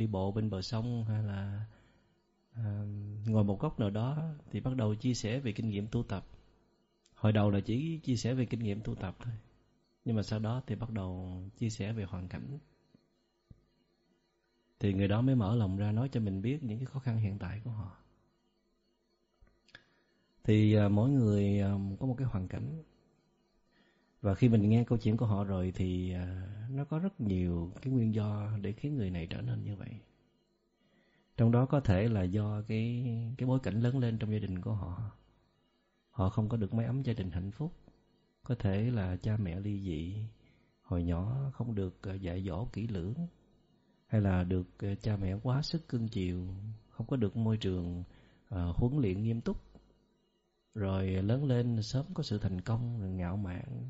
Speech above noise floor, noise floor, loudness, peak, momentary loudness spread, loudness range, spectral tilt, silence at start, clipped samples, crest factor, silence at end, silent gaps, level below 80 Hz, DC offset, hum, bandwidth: 44 dB; -76 dBFS; -34 LUFS; -14 dBFS; 13 LU; 7 LU; -8 dB/octave; 0 s; under 0.1%; 20 dB; 0 s; none; -54 dBFS; under 0.1%; none; 7.6 kHz